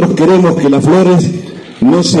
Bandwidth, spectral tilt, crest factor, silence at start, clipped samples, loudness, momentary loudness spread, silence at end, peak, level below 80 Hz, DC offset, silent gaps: 11.5 kHz; -6.5 dB/octave; 8 dB; 0 s; under 0.1%; -9 LUFS; 10 LU; 0 s; 0 dBFS; -46 dBFS; under 0.1%; none